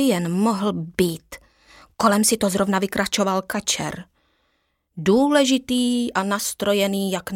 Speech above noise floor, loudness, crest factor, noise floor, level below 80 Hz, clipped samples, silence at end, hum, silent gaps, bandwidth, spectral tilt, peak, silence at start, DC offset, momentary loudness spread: 49 dB; -21 LUFS; 18 dB; -70 dBFS; -54 dBFS; under 0.1%; 0 s; none; none; 17 kHz; -4 dB/octave; -4 dBFS; 0 s; under 0.1%; 8 LU